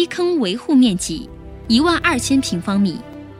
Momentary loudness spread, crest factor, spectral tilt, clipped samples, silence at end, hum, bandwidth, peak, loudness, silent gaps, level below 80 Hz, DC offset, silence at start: 15 LU; 16 dB; -4.5 dB/octave; under 0.1%; 0 s; none; 15.5 kHz; -2 dBFS; -17 LUFS; none; -40 dBFS; under 0.1%; 0 s